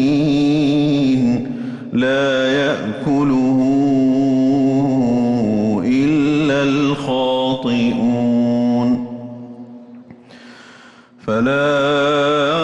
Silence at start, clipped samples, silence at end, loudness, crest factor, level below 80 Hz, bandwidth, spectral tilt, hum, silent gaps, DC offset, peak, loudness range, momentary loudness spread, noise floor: 0 s; under 0.1%; 0 s; -16 LUFS; 8 dB; -50 dBFS; 8.4 kHz; -6.5 dB/octave; none; none; under 0.1%; -8 dBFS; 6 LU; 7 LU; -44 dBFS